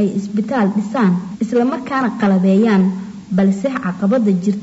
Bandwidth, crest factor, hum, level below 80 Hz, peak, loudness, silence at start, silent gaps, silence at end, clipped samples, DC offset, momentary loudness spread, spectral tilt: 8 kHz; 10 dB; none; -58 dBFS; -6 dBFS; -16 LUFS; 0 s; none; 0 s; under 0.1%; under 0.1%; 7 LU; -8 dB/octave